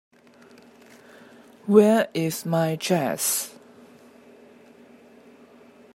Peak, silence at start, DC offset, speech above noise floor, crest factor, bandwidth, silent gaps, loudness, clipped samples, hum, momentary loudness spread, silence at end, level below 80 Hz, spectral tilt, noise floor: -2 dBFS; 1.65 s; under 0.1%; 31 dB; 24 dB; 16 kHz; none; -22 LUFS; under 0.1%; none; 10 LU; 2.45 s; -76 dBFS; -4.5 dB/octave; -52 dBFS